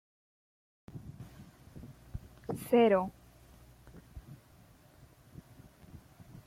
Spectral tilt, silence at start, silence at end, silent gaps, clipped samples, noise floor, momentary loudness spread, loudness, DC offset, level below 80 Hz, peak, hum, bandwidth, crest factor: -6.5 dB/octave; 0.95 s; 0.05 s; none; under 0.1%; -60 dBFS; 29 LU; -30 LUFS; under 0.1%; -60 dBFS; -16 dBFS; none; 16 kHz; 22 dB